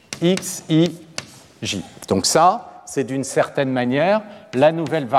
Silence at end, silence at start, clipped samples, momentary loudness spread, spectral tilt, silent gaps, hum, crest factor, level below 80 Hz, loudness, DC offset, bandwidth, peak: 0 s; 0.1 s; under 0.1%; 12 LU; -4.5 dB/octave; none; none; 16 dB; -60 dBFS; -20 LUFS; under 0.1%; 16 kHz; -2 dBFS